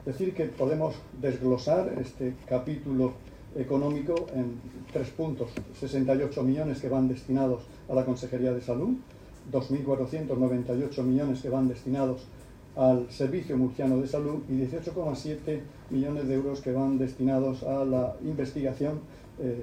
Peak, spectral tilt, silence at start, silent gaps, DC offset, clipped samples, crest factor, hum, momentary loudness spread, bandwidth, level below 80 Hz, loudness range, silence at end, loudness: -10 dBFS; -8.5 dB/octave; 0 s; none; under 0.1%; under 0.1%; 18 dB; none; 8 LU; 9.6 kHz; -52 dBFS; 2 LU; 0 s; -30 LUFS